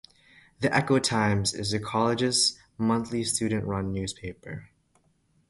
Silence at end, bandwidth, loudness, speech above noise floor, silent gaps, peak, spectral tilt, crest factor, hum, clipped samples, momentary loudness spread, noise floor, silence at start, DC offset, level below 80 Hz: 0.85 s; 11.5 kHz; -26 LUFS; 41 dB; none; -8 dBFS; -4 dB/octave; 20 dB; none; under 0.1%; 15 LU; -67 dBFS; 0.6 s; under 0.1%; -52 dBFS